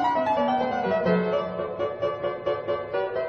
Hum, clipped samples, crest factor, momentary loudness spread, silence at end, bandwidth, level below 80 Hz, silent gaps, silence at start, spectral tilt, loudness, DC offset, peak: none; under 0.1%; 16 dB; 6 LU; 0 s; 7.4 kHz; -58 dBFS; none; 0 s; -7.5 dB/octave; -26 LUFS; under 0.1%; -10 dBFS